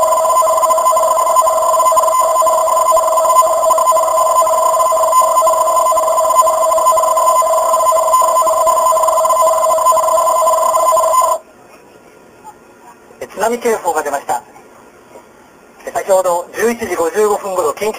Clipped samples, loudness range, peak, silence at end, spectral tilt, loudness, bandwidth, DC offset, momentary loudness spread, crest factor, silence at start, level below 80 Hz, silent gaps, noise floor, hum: under 0.1%; 10 LU; 0 dBFS; 0 s; -1.5 dB/octave; -12 LUFS; 15.5 kHz; under 0.1%; 6 LU; 12 dB; 0 s; -52 dBFS; none; -43 dBFS; none